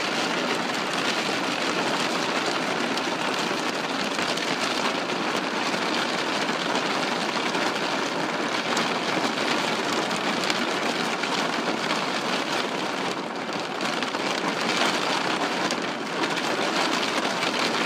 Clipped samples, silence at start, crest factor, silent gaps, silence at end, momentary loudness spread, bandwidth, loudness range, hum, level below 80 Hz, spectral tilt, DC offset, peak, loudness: under 0.1%; 0 s; 22 dB; none; 0 s; 3 LU; 15.5 kHz; 1 LU; none; -72 dBFS; -2.5 dB/octave; under 0.1%; -4 dBFS; -25 LUFS